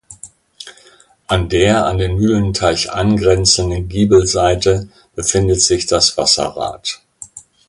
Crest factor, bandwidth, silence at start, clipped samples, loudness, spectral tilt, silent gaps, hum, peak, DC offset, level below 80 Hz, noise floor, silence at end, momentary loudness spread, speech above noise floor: 16 dB; 11.5 kHz; 0.1 s; under 0.1%; -14 LUFS; -4 dB/octave; none; none; 0 dBFS; under 0.1%; -32 dBFS; -48 dBFS; 0.3 s; 20 LU; 34 dB